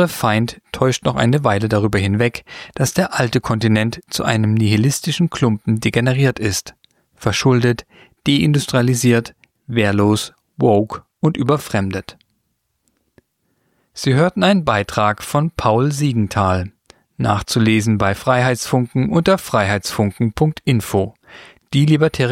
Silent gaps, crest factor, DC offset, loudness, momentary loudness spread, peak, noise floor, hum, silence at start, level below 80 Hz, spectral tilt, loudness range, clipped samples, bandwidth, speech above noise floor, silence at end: none; 16 dB; under 0.1%; -17 LUFS; 7 LU; -2 dBFS; -69 dBFS; none; 0 s; -44 dBFS; -5.5 dB/octave; 3 LU; under 0.1%; 16.5 kHz; 53 dB; 0 s